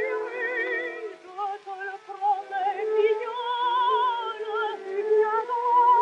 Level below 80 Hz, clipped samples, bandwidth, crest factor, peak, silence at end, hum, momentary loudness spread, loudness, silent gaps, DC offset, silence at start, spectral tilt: -86 dBFS; under 0.1%; 8.2 kHz; 14 dB; -12 dBFS; 0 s; none; 11 LU; -26 LUFS; none; under 0.1%; 0 s; -2.5 dB/octave